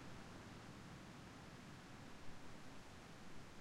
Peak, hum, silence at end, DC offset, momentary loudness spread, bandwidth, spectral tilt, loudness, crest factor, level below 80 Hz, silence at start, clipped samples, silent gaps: -40 dBFS; none; 0 s; under 0.1%; 2 LU; 15.5 kHz; -4.5 dB/octave; -58 LUFS; 16 dB; -68 dBFS; 0 s; under 0.1%; none